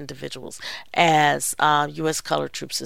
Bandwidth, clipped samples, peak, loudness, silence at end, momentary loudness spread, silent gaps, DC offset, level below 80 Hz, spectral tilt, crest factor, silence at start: 16.5 kHz; under 0.1%; 0 dBFS; -21 LUFS; 0 s; 16 LU; none; 0.6%; -58 dBFS; -3 dB/octave; 22 dB; 0 s